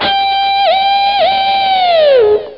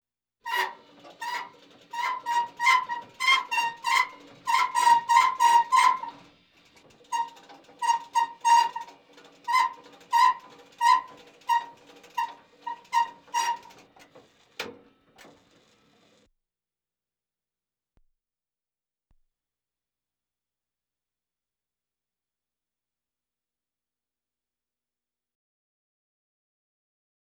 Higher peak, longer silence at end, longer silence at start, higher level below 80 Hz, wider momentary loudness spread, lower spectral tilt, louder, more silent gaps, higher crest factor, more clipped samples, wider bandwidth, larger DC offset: first, -2 dBFS vs -6 dBFS; second, 0 s vs 12.65 s; second, 0 s vs 0.45 s; first, -46 dBFS vs -78 dBFS; second, 3 LU vs 19 LU; first, -4.5 dB/octave vs 1 dB/octave; first, -10 LUFS vs -25 LUFS; neither; second, 8 dB vs 24 dB; neither; second, 5.6 kHz vs 20 kHz; first, 0.2% vs under 0.1%